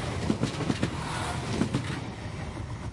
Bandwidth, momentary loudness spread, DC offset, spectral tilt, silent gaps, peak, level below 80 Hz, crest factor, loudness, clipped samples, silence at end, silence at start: 11.5 kHz; 8 LU; under 0.1%; -5.5 dB/octave; none; -10 dBFS; -46 dBFS; 20 dB; -31 LUFS; under 0.1%; 0 s; 0 s